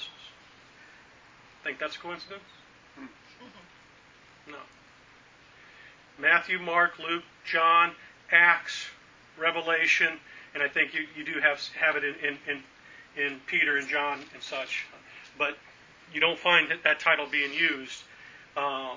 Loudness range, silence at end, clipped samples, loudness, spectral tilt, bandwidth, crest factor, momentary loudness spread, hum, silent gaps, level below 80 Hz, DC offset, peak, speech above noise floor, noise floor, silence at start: 17 LU; 0 s; under 0.1%; -26 LUFS; -2.5 dB/octave; 7.6 kHz; 24 dB; 21 LU; none; none; -72 dBFS; under 0.1%; -6 dBFS; 28 dB; -56 dBFS; 0 s